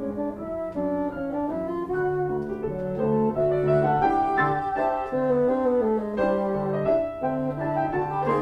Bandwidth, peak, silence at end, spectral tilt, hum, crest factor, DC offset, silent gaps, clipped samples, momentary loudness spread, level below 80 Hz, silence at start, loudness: 8.6 kHz; -10 dBFS; 0 s; -9 dB/octave; none; 14 dB; under 0.1%; none; under 0.1%; 7 LU; -50 dBFS; 0 s; -25 LUFS